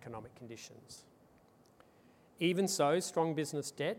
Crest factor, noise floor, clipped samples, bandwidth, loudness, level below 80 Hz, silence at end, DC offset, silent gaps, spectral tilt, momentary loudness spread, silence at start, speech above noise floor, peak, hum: 20 dB; -65 dBFS; under 0.1%; 16.5 kHz; -34 LUFS; -78 dBFS; 0 s; under 0.1%; none; -4.5 dB/octave; 21 LU; 0 s; 30 dB; -18 dBFS; none